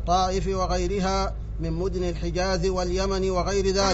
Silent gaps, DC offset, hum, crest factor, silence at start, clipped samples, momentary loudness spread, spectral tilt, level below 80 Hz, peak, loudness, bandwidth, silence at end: none; under 0.1%; none; 14 dB; 0 s; under 0.1%; 5 LU; -4.5 dB/octave; -30 dBFS; -10 dBFS; -26 LUFS; 8 kHz; 0 s